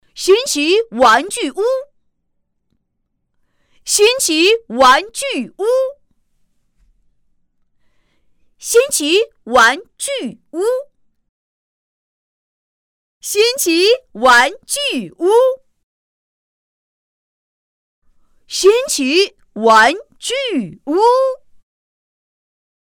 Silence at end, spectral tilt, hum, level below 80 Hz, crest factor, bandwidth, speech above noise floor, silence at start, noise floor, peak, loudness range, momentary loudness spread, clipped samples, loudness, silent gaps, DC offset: 1.5 s; -1.5 dB/octave; none; -56 dBFS; 14 dB; 19.5 kHz; 55 dB; 0.15 s; -69 dBFS; -2 dBFS; 8 LU; 12 LU; under 0.1%; -14 LUFS; 11.29-13.21 s, 15.83-18.02 s; under 0.1%